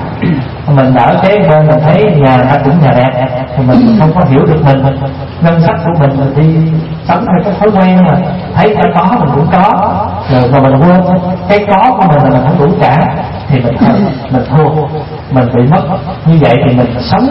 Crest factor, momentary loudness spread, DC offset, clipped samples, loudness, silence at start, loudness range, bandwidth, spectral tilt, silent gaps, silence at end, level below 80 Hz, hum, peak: 8 dB; 7 LU; under 0.1%; 0.4%; -8 LUFS; 0 s; 2 LU; 5.8 kHz; -10.5 dB/octave; none; 0 s; -32 dBFS; none; 0 dBFS